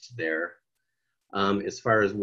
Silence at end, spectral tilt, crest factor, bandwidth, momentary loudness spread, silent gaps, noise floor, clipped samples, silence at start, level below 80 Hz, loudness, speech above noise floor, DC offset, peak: 0 s; -5.5 dB/octave; 20 dB; 7.8 kHz; 11 LU; none; -81 dBFS; under 0.1%; 0.05 s; -62 dBFS; -27 LUFS; 55 dB; under 0.1%; -8 dBFS